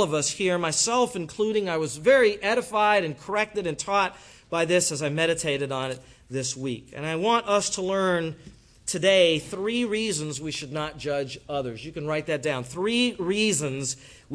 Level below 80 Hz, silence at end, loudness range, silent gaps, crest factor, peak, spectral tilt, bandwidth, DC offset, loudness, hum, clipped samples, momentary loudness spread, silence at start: -58 dBFS; 0 s; 5 LU; none; 18 dB; -8 dBFS; -3.5 dB/octave; 11 kHz; under 0.1%; -25 LUFS; none; under 0.1%; 11 LU; 0 s